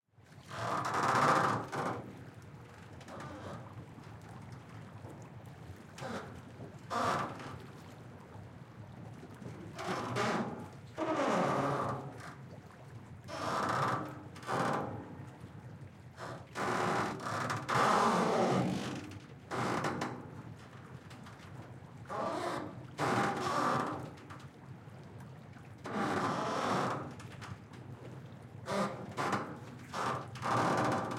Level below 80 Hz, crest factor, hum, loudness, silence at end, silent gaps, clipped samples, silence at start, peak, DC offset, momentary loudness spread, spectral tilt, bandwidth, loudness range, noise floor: -70 dBFS; 24 dB; none; -35 LUFS; 0 s; none; under 0.1%; 0.2 s; -14 dBFS; under 0.1%; 20 LU; -5 dB/octave; 16.5 kHz; 10 LU; -57 dBFS